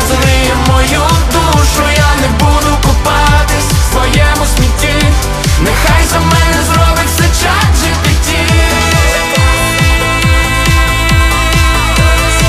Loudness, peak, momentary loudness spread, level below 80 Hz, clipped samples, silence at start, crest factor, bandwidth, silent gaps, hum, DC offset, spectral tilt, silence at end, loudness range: -9 LUFS; 0 dBFS; 2 LU; -14 dBFS; 0.3%; 0 s; 8 dB; 16 kHz; none; none; under 0.1%; -4 dB/octave; 0 s; 1 LU